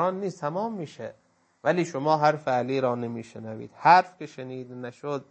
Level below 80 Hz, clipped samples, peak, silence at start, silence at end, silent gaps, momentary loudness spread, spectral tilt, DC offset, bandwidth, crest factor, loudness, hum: -76 dBFS; under 0.1%; -4 dBFS; 0 s; 0.1 s; none; 20 LU; -6 dB/octave; under 0.1%; 8.6 kHz; 22 dB; -25 LUFS; none